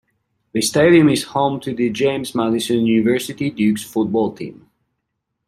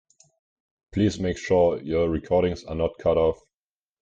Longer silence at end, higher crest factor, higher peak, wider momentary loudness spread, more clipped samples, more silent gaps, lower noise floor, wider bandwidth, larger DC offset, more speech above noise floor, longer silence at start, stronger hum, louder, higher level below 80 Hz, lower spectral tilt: first, 0.95 s vs 0.7 s; about the same, 16 dB vs 16 dB; first, -2 dBFS vs -10 dBFS; first, 11 LU vs 7 LU; neither; neither; second, -76 dBFS vs under -90 dBFS; first, 15.5 kHz vs 8.8 kHz; neither; second, 59 dB vs over 67 dB; second, 0.55 s vs 0.95 s; neither; first, -18 LUFS vs -24 LUFS; second, -56 dBFS vs -46 dBFS; second, -5 dB/octave vs -7 dB/octave